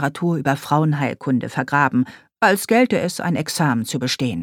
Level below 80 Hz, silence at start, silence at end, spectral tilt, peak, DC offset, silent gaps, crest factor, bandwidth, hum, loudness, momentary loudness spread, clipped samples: -60 dBFS; 0 s; 0 s; -5.5 dB/octave; -2 dBFS; under 0.1%; none; 18 dB; 19 kHz; none; -19 LUFS; 6 LU; under 0.1%